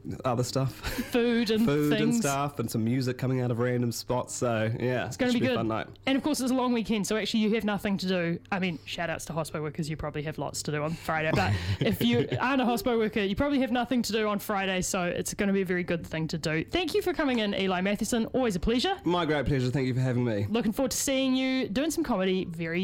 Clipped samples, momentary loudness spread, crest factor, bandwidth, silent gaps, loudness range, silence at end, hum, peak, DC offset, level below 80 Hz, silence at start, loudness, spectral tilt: under 0.1%; 6 LU; 16 dB; 17 kHz; none; 3 LU; 0 s; none; -12 dBFS; under 0.1%; -50 dBFS; 0.05 s; -28 LUFS; -5 dB/octave